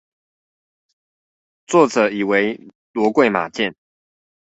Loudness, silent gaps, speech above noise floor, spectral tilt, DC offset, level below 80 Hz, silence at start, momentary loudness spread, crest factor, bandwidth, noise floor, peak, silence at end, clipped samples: -18 LUFS; 2.75-2.94 s; over 73 dB; -5 dB/octave; under 0.1%; -64 dBFS; 1.7 s; 9 LU; 20 dB; 8.2 kHz; under -90 dBFS; -2 dBFS; 0.7 s; under 0.1%